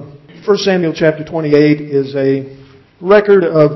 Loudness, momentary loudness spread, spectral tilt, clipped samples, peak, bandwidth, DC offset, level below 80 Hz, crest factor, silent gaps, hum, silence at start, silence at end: -12 LUFS; 11 LU; -7 dB/octave; under 0.1%; 0 dBFS; 6.2 kHz; under 0.1%; -52 dBFS; 12 dB; none; none; 0 s; 0 s